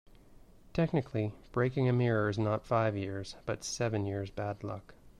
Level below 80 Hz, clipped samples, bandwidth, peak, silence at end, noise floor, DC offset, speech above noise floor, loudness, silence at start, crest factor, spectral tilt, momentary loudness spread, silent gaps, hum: -58 dBFS; under 0.1%; 12 kHz; -16 dBFS; 0.1 s; -56 dBFS; under 0.1%; 24 dB; -33 LUFS; 0.75 s; 16 dB; -6.5 dB/octave; 10 LU; none; none